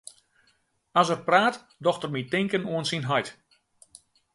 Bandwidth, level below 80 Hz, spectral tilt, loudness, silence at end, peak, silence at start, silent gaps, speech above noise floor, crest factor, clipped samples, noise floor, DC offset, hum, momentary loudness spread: 11.5 kHz; -70 dBFS; -4.5 dB/octave; -25 LUFS; 1 s; -6 dBFS; 0.95 s; none; 43 dB; 22 dB; under 0.1%; -69 dBFS; under 0.1%; none; 8 LU